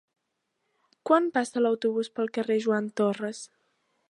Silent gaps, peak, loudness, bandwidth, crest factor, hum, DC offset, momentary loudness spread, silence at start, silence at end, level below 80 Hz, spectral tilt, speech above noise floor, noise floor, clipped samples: none; -8 dBFS; -27 LUFS; 11.5 kHz; 22 dB; none; under 0.1%; 14 LU; 1.05 s; 0.65 s; -82 dBFS; -5 dB/octave; 54 dB; -80 dBFS; under 0.1%